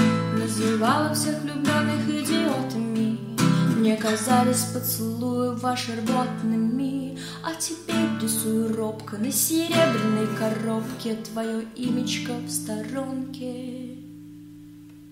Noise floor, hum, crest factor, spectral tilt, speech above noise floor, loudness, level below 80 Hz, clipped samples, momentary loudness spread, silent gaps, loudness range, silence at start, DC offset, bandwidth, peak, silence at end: -45 dBFS; none; 18 dB; -4.5 dB/octave; 20 dB; -25 LUFS; -62 dBFS; under 0.1%; 11 LU; none; 6 LU; 0 s; under 0.1%; 16 kHz; -8 dBFS; 0 s